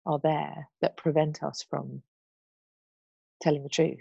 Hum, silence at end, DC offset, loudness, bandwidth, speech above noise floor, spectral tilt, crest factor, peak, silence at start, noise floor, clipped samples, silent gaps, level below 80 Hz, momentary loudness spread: none; 0 s; under 0.1%; -29 LUFS; 8.2 kHz; over 61 dB; -6 dB/octave; 20 dB; -10 dBFS; 0.05 s; under -90 dBFS; under 0.1%; 2.08-3.40 s; -72 dBFS; 10 LU